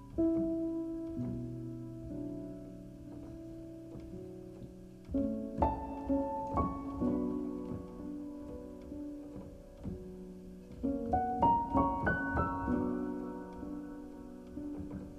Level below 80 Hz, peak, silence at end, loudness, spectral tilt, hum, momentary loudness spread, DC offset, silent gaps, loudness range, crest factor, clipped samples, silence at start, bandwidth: -50 dBFS; -16 dBFS; 0 s; -37 LUFS; -9 dB/octave; none; 17 LU; under 0.1%; none; 11 LU; 22 dB; under 0.1%; 0 s; 12 kHz